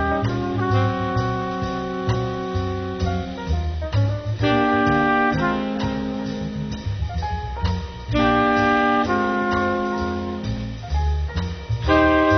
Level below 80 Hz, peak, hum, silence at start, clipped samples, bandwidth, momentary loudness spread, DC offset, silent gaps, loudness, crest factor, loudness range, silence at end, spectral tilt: -32 dBFS; -4 dBFS; none; 0 s; under 0.1%; 6.4 kHz; 10 LU; under 0.1%; none; -22 LUFS; 16 dB; 4 LU; 0 s; -7 dB/octave